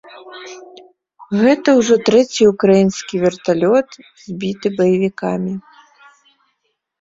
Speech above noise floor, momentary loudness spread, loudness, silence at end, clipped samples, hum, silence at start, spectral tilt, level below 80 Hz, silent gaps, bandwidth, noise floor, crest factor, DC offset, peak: 55 dB; 21 LU; -15 LUFS; 1.4 s; under 0.1%; none; 0.15 s; -5.5 dB/octave; -56 dBFS; none; 7.8 kHz; -70 dBFS; 16 dB; under 0.1%; -2 dBFS